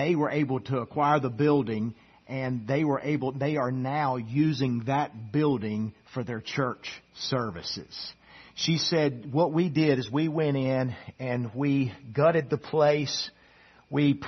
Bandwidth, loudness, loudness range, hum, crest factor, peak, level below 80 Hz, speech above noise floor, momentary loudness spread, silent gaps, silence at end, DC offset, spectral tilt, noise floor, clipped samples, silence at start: 6.4 kHz; -28 LUFS; 4 LU; none; 18 dB; -10 dBFS; -64 dBFS; 30 dB; 11 LU; none; 0 s; under 0.1%; -6.5 dB/octave; -57 dBFS; under 0.1%; 0 s